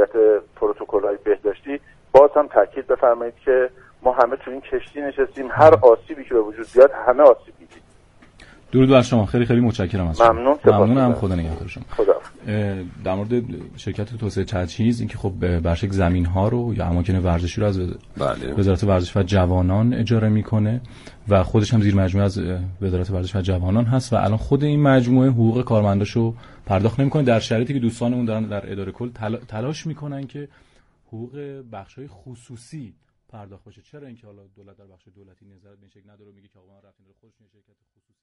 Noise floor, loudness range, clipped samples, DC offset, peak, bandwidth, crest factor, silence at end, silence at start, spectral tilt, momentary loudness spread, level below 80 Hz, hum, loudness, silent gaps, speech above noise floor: -51 dBFS; 12 LU; under 0.1%; under 0.1%; 0 dBFS; 11 kHz; 20 dB; 4.1 s; 0 s; -8 dB/octave; 16 LU; -40 dBFS; none; -19 LUFS; none; 31 dB